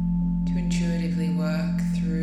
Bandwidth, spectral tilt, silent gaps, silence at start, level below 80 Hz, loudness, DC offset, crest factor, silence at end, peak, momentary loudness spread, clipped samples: 9.6 kHz; -7.5 dB/octave; none; 0 s; -36 dBFS; -25 LUFS; under 0.1%; 10 dB; 0 s; -14 dBFS; 1 LU; under 0.1%